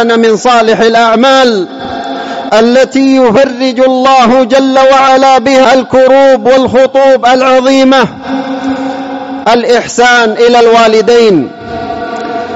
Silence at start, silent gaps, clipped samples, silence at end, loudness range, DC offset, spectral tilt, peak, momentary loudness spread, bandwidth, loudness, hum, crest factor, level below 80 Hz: 0 s; none; 0.7%; 0 s; 3 LU; under 0.1%; -4 dB/octave; 0 dBFS; 12 LU; 8 kHz; -6 LUFS; none; 6 dB; -44 dBFS